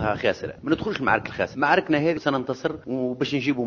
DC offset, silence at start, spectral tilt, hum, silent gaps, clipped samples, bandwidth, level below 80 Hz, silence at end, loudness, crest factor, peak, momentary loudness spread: under 0.1%; 0 s; -6.5 dB/octave; none; none; under 0.1%; 7.2 kHz; -50 dBFS; 0 s; -24 LUFS; 20 dB; -4 dBFS; 8 LU